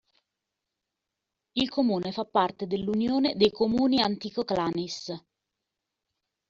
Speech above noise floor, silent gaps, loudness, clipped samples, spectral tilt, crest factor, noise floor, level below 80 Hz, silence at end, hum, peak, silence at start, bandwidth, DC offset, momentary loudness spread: 59 dB; none; -27 LUFS; under 0.1%; -4 dB/octave; 20 dB; -86 dBFS; -62 dBFS; 1.3 s; none; -8 dBFS; 1.55 s; 7.6 kHz; under 0.1%; 11 LU